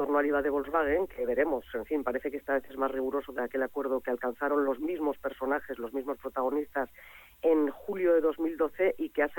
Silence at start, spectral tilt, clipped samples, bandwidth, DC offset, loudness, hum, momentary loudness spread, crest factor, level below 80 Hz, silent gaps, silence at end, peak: 0 s; -6.5 dB/octave; under 0.1%; 17.5 kHz; under 0.1%; -31 LUFS; none; 8 LU; 16 dB; -58 dBFS; none; 0 s; -14 dBFS